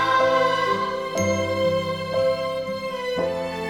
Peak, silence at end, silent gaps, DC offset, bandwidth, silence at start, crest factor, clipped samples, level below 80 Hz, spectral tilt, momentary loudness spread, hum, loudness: -8 dBFS; 0 s; none; under 0.1%; 15.5 kHz; 0 s; 16 dB; under 0.1%; -56 dBFS; -4.5 dB/octave; 8 LU; none; -23 LUFS